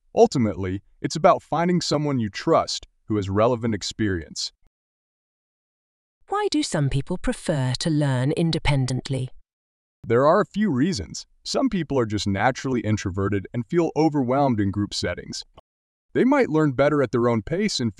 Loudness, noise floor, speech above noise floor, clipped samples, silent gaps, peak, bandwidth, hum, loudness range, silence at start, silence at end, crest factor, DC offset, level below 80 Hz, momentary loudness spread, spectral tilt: -23 LUFS; under -90 dBFS; over 68 dB; under 0.1%; 4.67-6.21 s, 9.53-10.03 s, 15.60-16.09 s; -4 dBFS; 12 kHz; none; 5 LU; 0.15 s; 0.05 s; 20 dB; under 0.1%; -44 dBFS; 10 LU; -6 dB/octave